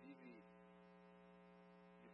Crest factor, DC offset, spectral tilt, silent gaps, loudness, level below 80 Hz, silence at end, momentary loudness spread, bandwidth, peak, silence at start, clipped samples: 14 dB; under 0.1%; -6 dB/octave; none; -65 LUFS; -90 dBFS; 0 s; 5 LU; 5.6 kHz; -50 dBFS; 0 s; under 0.1%